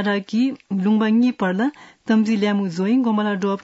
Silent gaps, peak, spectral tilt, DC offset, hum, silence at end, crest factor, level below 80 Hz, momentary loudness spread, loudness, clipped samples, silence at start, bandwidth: none; -8 dBFS; -7 dB/octave; under 0.1%; none; 0 s; 12 dB; -70 dBFS; 6 LU; -20 LUFS; under 0.1%; 0 s; 8 kHz